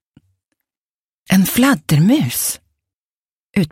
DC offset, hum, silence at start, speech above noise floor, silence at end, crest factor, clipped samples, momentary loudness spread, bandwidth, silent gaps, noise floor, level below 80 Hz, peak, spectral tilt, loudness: under 0.1%; none; 1.3 s; over 76 dB; 0.05 s; 16 dB; under 0.1%; 9 LU; 16.5 kHz; 2.94-3.51 s; under -90 dBFS; -48 dBFS; -2 dBFS; -5 dB/octave; -15 LUFS